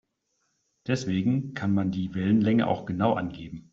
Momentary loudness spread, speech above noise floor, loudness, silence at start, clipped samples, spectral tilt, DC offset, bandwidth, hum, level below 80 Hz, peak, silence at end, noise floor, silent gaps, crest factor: 9 LU; 50 dB; -26 LUFS; 0.85 s; under 0.1%; -7 dB/octave; under 0.1%; 7.8 kHz; none; -60 dBFS; -10 dBFS; 0.15 s; -76 dBFS; none; 18 dB